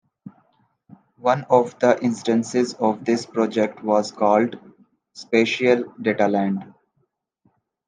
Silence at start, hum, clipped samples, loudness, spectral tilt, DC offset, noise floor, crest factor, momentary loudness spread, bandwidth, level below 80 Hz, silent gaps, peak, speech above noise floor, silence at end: 0.25 s; none; under 0.1%; -21 LUFS; -5.5 dB/octave; under 0.1%; -70 dBFS; 20 dB; 7 LU; 9.8 kHz; -72 dBFS; none; -2 dBFS; 50 dB; 1.2 s